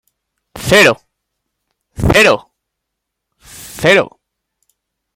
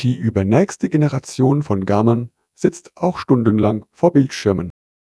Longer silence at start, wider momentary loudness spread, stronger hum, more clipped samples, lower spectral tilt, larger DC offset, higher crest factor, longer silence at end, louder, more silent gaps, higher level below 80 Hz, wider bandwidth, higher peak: first, 0.55 s vs 0 s; first, 17 LU vs 7 LU; neither; neither; second, -4 dB/octave vs -7.5 dB/octave; neither; about the same, 16 dB vs 18 dB; first, 1.1 s vs 0.45 s; first, -11 LUFS vs -18 LUFS; neither; first, -36 dBFS vs -50 dBFS; first, 17 kHz vs 11 kHz; about the same, 0 dBFS vs 0 dBFS